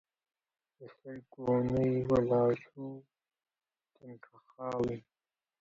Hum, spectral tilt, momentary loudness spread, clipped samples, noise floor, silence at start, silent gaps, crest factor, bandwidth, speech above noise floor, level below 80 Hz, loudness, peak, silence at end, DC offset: none; -9.5 dB/octave; 23 LU; under 0.1%; under -90 dBFS; 0.8 s; none; 18 dB; 7.6 kHz; over 57 dB; -62 dBFS; -32 LUFS; -18 dBFS; 0.6 s; under 0.1%